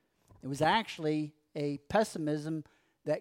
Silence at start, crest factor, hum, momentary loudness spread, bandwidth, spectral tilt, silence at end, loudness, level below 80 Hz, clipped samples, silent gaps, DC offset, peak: 0.45 s; 20 dB; none; 13 LU; 16 kHz; -5.5 dB/octave; 0 s; -33 LUFS; -66 dBFS; under 0.1%; none; under 0.1%; -14 dBFS